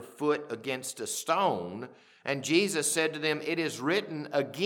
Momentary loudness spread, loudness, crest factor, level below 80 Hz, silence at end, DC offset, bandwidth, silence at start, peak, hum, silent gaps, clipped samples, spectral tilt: 9 LU; -30 LUFS; 18 dB; -82 dBFS; 0 s; under 0.1%; 19 kHz; 0 s; -12 dBFS; none; none; under 0.1%; -3 dB/octave